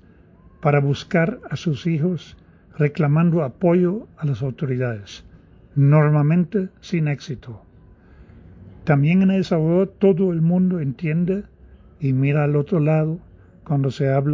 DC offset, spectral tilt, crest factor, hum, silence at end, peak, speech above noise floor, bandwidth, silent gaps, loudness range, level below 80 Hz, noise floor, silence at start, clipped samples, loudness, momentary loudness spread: under 0.1%; -9 dB/octave; 16 dB; none; 0 s; -4 dBFS; 30 dB; 7.4 kHz; none; 3 LU; -50 dBFS; -49 dBFS; 0.6 s; under 0.1%; -20 LUFS; 11 LU